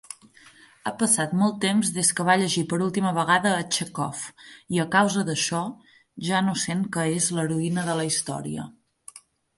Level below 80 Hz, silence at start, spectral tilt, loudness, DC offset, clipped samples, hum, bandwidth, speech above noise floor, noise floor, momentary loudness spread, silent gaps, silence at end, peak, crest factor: -66 dBFS; 0.1 s; -3.5 dB/octave; -24 LUFS; under 0.1%; under 0.1%; none; 12 kHz; 28 dB; -53 dBFS; 13 LU; none; 0.4 s; -6 dBFS; 20 dB